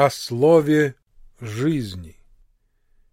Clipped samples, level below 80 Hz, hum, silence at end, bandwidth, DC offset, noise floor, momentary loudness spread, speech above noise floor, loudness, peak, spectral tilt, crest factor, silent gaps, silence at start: under 0.1%; -52 dBFS; none; 1 s; 16 kHz; under 0.1%; -61 dBFS; 19 LU; 42 dB; -19 LUFS; -2 dBFS; -6.5 dB/octave; 20 dB; none; 0 s